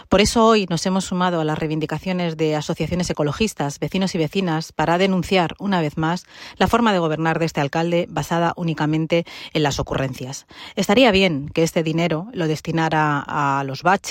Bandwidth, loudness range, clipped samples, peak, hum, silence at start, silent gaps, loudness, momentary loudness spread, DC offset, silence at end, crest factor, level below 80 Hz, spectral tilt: 16.5 kHz; 3 LU; under 0.1%; -2 dBFS; none; 0.1 s; none; -20 LUFS; 8 LU; under 0.1%; 0 s; 18 dB; -44 dBFS; -5 dB/octave